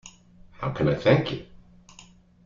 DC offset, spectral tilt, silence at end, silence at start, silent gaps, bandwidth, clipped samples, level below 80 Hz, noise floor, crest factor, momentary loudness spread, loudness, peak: under 0.1%; -7 dB/octave; 1 s; 0.05 s; none; 7.4 kHz; under 0.1%; -52 dBFS; -52 dBFS; 22 dB; 13 LU; -24 LUFS; -6 dBFS